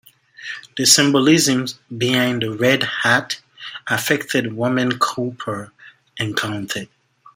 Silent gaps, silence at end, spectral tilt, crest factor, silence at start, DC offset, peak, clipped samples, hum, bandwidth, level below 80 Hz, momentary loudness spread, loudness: none; 0.5 s; -3 dB/octave; 20 dB; 0.4 s; under 0.1%; 0 dBFS; under 0.1%; none; 16.5 kHz; -62 dBFS; 17 LU; -18 LUFS